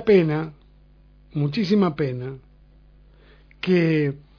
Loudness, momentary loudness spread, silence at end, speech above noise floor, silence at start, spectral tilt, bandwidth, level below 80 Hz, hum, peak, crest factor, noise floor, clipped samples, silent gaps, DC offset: -22 LUFS; 16 LU; 0.2 s; 31 dB; 0 s; -8.5 dB/octave; 5.4 kHz; -52 dBFS; 50 Hz at -45 dBFS; -6 dBFS; 18 dB; -52 dBFS; under 0.1%; none; under 0.1%